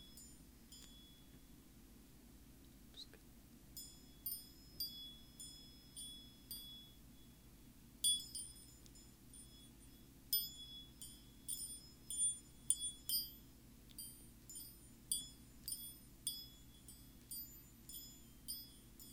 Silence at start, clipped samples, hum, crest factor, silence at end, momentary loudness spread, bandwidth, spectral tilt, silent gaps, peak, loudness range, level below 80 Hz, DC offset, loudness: 0 s; under 0.1%; 50 Hz at -70 dBFS; 32 dB; 0 s; 24 LU; 18 kHz; -0.5 dB/octave; none; -18 dBFS; 11 LU; -66 dBFS; under 0.1%; -45 LUFS